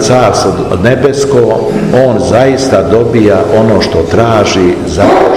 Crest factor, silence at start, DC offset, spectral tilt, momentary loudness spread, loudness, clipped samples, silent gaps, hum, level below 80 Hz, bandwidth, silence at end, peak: 8 dB; 0 s; 0.9%; -6 dB/octave; 3 LU; -8 LUFS; 5%; none; none; -30 dBFS; 15 kHz; 0 s; 0 dBFS